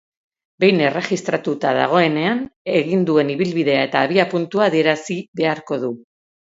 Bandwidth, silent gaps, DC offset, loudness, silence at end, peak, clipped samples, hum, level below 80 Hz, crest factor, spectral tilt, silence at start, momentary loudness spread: 8 kHz; 2.56-2.65 s, 5.28-5.33 s; under 0.1%; -18 LUFS; 0.6 s; 0 dBFS; under 0.1%; none; -64 dBFS; 18 dB; -6 dB/octave; 0.6 s; 8 LU